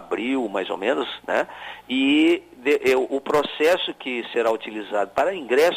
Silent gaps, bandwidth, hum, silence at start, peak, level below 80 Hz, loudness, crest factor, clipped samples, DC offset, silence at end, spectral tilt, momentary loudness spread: none; 15.5 kHz; none; 0 s; -8 dBFS; -62 dBFS; -22 LUFS; 14 dB; under 0.1%; under 0.1%; 0 s; -4 dB/octave; 8 LU